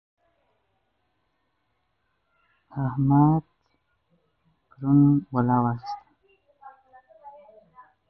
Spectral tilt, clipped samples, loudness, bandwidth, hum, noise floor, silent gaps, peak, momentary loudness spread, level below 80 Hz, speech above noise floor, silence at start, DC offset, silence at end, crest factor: -11.5 dB/octave; under 0.1%; -22 LUFS; 5.8 kHz; none; -75 dBFS; none; -8 dBFS; 17 LU; -58 dBFS; 54 dB; 2.75 s; under 0.1%; 0.8 s; 20 dB